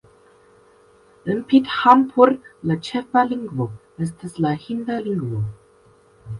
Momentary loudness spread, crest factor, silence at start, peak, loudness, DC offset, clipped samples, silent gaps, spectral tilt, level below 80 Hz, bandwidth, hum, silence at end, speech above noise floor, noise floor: 14 LU; 20 dB; 1.25 s; 0 dBFS; -20 LUFS; under 0.1%; under 0.1%; none; -7.5 dB/octave; -56 dBFS; 11.5 kHz; none; 0 s; 34 dB; -54 dBFS